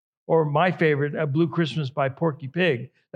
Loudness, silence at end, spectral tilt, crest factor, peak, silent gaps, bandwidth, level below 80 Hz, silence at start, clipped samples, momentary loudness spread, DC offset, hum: -23 LUFS; 0.3 s; -8 dB/octave; 16 dB; -6 dBFS; none; 8.2 kHz; -80 dBFS; 0.3 s; under 0.1%; 6 LU; under 0.1%; none